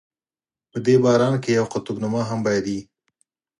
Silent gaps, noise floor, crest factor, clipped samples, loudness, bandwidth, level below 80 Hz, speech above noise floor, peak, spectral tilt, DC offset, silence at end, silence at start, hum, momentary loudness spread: none; under -90 dBFS; 18 dB; under 0.1%; -21 LUFS; 11.5 kHz; -60 dBFS; over 70 dB; -4 dBFS; -6.5 dB/octave; under 0.1%; 0.8 s; 0.75 s; none; 12 LU